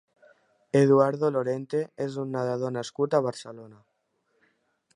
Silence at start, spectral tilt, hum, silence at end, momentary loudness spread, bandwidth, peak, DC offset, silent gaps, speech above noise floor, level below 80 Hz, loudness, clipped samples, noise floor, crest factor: 0.75 s; -7 dB/octave; none; 1.25 s; 12 LU; 11 kHz; -8 dBFS; under 0.1%; none; 48 dB; -76 dBFS; -26 LUFS; under 0.1%; -74 dBFS; 20 dB